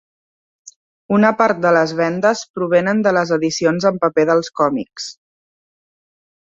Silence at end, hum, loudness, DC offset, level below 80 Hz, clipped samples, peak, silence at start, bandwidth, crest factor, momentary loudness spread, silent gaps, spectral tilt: 1.35 s; none; -16 LUFS; under 0.1%; -62 dBFS; under 0.1%; -2 dBFS; 1.1 s; 7.8 kHz; 16 dB; 7 LU; 2.50-2.54 s; -5.5 dB/octave